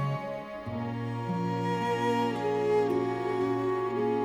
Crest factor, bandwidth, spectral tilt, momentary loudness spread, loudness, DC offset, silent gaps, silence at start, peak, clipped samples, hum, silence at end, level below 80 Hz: 14 dB; 17.5 kHz; -7.5 dB/octave; 8 LU; -30 LUFS; under 0.1%; none; 0 s; -16 dBFS; under 0.1%; none; 0 s; -62 dBFS